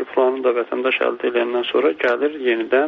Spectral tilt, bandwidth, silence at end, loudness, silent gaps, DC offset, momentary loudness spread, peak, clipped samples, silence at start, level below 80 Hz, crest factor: -0.5 dB/octave; 6 kHz; 0 s; -19 LUFS; none; under 0.1%; 3 LU; -4 dBFS; under 0.1%; 0 s; -66 dBFS; 14 dB